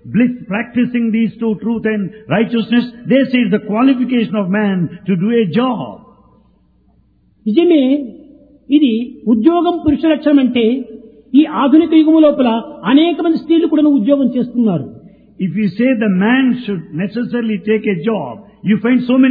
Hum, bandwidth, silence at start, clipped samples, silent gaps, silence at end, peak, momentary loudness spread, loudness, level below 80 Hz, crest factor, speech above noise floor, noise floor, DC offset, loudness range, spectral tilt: none; 4.9 kHz; 0.05 s; under 0.1%; none; 0 s; 0 dBFS; 9 LU; -14 LUFS; -50 dBFS; 14 dB; 40 dB; -53 dBFS; under 0.1%; 5 LU; -10.5 dB/octave